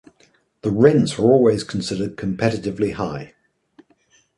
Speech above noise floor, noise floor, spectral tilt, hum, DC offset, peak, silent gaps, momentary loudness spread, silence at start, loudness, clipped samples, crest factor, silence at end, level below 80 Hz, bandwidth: 41 dB; -59 dBFS; -6.5 dB/octave; none; under 0.1%; -2 dBFS; none; 12 LU; 0.65 s; -19 LUFS; under 0.1%; 18 dB; 1.1 s; -50 dBFS; 11.5 kHz